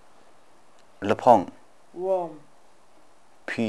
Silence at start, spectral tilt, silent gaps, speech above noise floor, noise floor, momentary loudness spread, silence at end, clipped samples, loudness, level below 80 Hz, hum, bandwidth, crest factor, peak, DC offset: 1 s; -6.5 dB/octave; none; 37 dB; -59 dBFS; 22 LU; 0 s; under 0.1%; -24 LUFS; -72 dBFS; none; 12 kHz; 24 dB; -4 dBFS; 0.3%